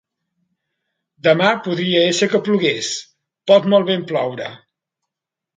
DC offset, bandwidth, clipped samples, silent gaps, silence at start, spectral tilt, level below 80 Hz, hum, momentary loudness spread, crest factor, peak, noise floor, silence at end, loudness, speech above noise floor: under 0.1%; 9.4 kHz; under 0.1%; none; 1.25 s; -4.5 dB/octave; -68 dBFS; none; 13 LU; 18 dB; 0 dBFS; -84 dBFS; 1 s; -17 LUFS; 68 dB